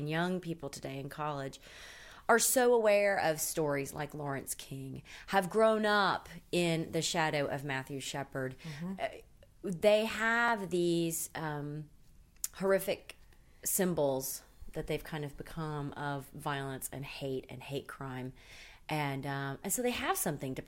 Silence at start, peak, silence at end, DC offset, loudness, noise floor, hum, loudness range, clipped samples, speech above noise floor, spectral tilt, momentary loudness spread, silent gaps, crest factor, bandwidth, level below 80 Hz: 0 s; -12 dBFS; 0 s; under 0.1%; -33 LUFS; -58 dBFS; none; 9 LU; under 0.1%; 25 dB; -4 dB/octave; 16 LU; none; 22 dB; 16 kHz; -60 dBFS